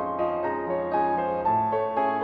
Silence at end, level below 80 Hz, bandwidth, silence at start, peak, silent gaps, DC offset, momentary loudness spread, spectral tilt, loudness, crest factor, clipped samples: 0 s; -58 dBFS; 5 kHz; 0 s; -12 dBFS; none; under 0.1%; 4 LU; -9 dB/octave; -26 LUFS; 12 dB; under 0.1%